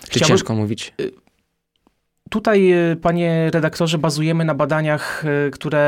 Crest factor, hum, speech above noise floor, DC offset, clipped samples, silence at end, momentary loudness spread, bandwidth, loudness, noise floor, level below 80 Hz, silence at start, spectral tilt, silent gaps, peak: 16 dB; none; 51 dB; under 0.1%; under 0.1%; 0 s; 10 LU; 15 kHz; -18 LUFS; -69 dBFS; -52 dBFS; 0 s; -5.5 dB/octave; none; -2 dBFS